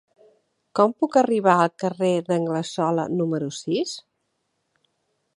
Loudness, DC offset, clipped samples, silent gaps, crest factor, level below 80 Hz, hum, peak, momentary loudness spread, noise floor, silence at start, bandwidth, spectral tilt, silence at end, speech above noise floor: -22 LUFS; under 0.1%; under 0.1%; none; 20 dB; -74 dBFS; none; -2 dBFS; 8 LU; -74 dBFS; 0.75 s; 11.5 kHz; -6 dB/octave; 1.35 s; 53 dB